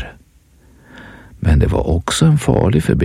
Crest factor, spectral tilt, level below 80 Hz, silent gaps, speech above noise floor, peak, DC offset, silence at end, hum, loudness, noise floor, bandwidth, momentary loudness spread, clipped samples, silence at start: 16 dB; -6.5 dB/octave; -24 dBFS; none; 36 dB; 0 dBFS; under 0.1%; 0 s; none; -15 LUFS; -49 dBFS; 14.5 kHz; 6 LU; under 0.1%; 0 s